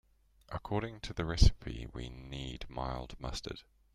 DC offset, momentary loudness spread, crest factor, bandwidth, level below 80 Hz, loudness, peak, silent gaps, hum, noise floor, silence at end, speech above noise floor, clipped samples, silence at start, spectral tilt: under 0.1%; 16 LU; 26 dB; 11.5 kHz; -38 dBFS; -37 LUFS; -10 dBFS; none; none; -58 dBFS; 0.35 s; 24 dB; under 0.1%; 0.5 s; -5.5 dB/octave